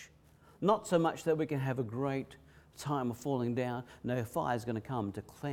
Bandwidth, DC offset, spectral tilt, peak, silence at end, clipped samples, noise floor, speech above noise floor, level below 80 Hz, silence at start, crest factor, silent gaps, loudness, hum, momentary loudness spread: 17.5 kHz; under 0.1%; -6.5 dB/octave; -14 dBFS; 0 s; under 0.1%; -62 dBFS; 28 dB; -66 dBFS; 0 s; 20 dB; none; -35 LUFS; none; 9 LU